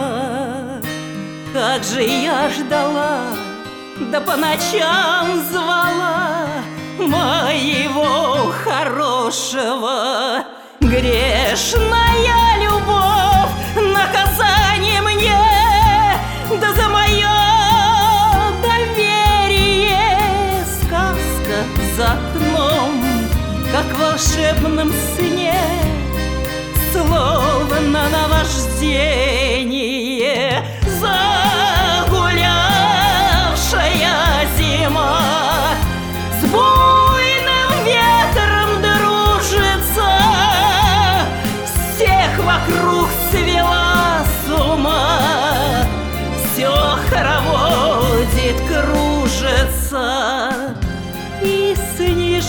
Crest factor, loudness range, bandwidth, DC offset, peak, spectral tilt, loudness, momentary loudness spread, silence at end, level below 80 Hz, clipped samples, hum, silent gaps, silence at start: 14 dB; 4 LU; over 20 kHz; under 0.1%; 0 dBFS; -4 dB/octave; -15 LUFS; 8 LU; 0 s; -24 dBFS; under 0.1%; none; none; 0 s